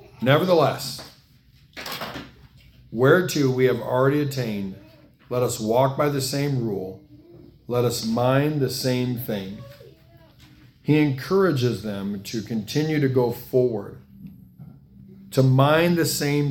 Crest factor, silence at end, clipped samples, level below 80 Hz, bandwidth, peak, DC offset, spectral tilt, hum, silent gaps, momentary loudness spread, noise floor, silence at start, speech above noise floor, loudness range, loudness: 22 dB; 0 s; under 0.1%; -56 dBFS; 18 kHz; -2 dBFS; under 0.1%; -6 dB/octave; none; none; 15 LU; -55 dBFS; 0.2 s; 33 dB; 3 LU; -22 LUFS